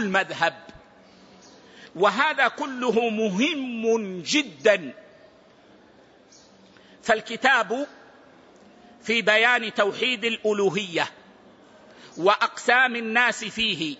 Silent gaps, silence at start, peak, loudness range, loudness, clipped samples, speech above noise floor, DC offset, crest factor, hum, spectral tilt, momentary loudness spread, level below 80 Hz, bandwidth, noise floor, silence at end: none; 0 s; -6 dBFS; 4 LU; -22 LUFS; under 0.1%; 31 dB; under 0.1%; 20 dB; none; -3.5 dB/octave; 8 LU; -66 dBFS; 8 kHz; -54 dBFS; 0.05 s